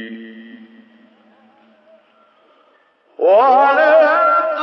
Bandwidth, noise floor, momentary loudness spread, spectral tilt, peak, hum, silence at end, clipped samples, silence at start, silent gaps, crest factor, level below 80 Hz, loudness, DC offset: 6 kHz; -55 dBFS; 22 LU; -5 dB/octave; -2 dBFS; none; 0 s; under 0.1%; 0 s; none; 14 dB; under -90 dBFS; -12 LUFS; under 0.1%